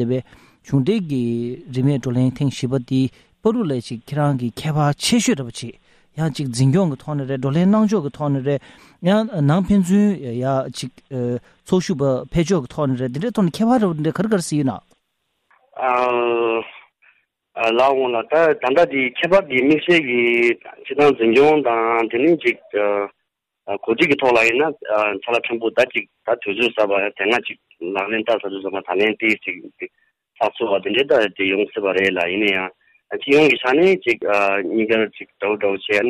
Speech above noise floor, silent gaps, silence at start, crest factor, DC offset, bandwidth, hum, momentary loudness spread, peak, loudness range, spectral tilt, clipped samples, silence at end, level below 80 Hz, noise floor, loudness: 55 dB; none; 0 s; 14 dB; under 0.1%; 15 kHz; none; 11 LU; -4 dBFS; 5 LU; -6 dB/octave; under 0.1%; 0 s; -52 dBFS; -73 dBFS; -19 LUFS